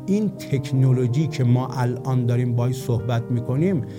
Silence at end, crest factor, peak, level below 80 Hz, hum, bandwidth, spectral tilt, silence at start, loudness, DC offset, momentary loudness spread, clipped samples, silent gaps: 0 s; 14 dB; -8 dBFS; -54 dBFS; none; 16 kHz; -8 dB/octave; 0 s; -22 LUFS; under 0.1%; 5 LU; under 0.1%; none